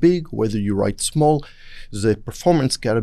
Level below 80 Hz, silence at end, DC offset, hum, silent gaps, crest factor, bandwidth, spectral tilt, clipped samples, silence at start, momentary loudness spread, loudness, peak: -40 dBFS; 0 s; under 0.1%; none; none; 16 dB; 13.5 kHz; -5.5 dB/octave; under 0.1%; 0 s; 5 LU; -20 LUFS; -4 dBFS